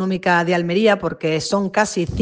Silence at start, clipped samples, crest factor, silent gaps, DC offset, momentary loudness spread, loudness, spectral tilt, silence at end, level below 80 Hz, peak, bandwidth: 0 s; under 0.1%; 16 dB; none; under 0.1%; 4 LU; -18 LUFS; -5 dB/octave; 0 s; -46 dBFS; -2 dBFS; 9.8 kHz